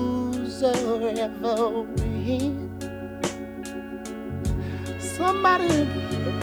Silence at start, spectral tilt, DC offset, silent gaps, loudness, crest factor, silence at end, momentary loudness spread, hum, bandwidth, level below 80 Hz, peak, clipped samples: 0 s; -5.5 dB/octave; under 0.1%; none; -26 LUFS; 18 dB; 0 s; 13 LU; none; over 20 kHz; -42 dBFS; -6 dBFS; under 0.1%